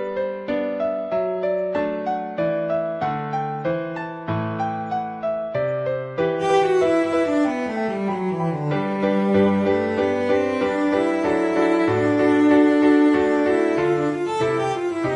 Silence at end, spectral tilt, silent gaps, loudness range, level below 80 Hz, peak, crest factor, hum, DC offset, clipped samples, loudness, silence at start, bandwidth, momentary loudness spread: 0 s; -7 dB/octave; none; 7 LU; -60 dBFS; -6 dBFS; 14 dB; none; under 0.1%; under 0.1%; -21 LUFS; 0 s; 10.5 kHz; 9 LU